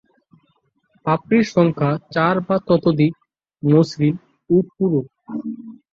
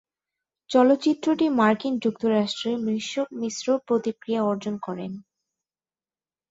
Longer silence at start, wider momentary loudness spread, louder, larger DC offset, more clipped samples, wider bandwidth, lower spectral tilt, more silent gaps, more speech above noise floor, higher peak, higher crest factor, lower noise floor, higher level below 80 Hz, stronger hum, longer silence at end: first, 1.05 s vs 0.7 s; first, 14 LU vs 11 LU; first, -19 LUFS vs -24 LUFS; neither; neither; about the same, 7.6 kHz vs 8 kHz; first, -8 dB/octave vs -5 dB/octave; neither; second, 48 dB vs over 67 dB; first, -2 dBFS vs -6 dBFS; about the same, 18 dB vs 18 dB; second, -65 dBFS vs under -90 dBFS; first, -56 dBFS vs -70 dBFS; neither; second, 0.2 s vs 1.3 s